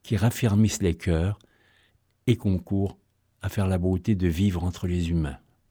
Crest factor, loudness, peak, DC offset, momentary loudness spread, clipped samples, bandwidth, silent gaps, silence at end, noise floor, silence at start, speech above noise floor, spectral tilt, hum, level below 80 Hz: 16 dB; -26 LUFS; -8 dBFS; under 0.1%; 10 LU; under 0.1%; over 20 kHz; none; 0.35 s; -65 dBFS; 0.05 s; 41 dB; -6.5 dB/octave; none; -40 dBFS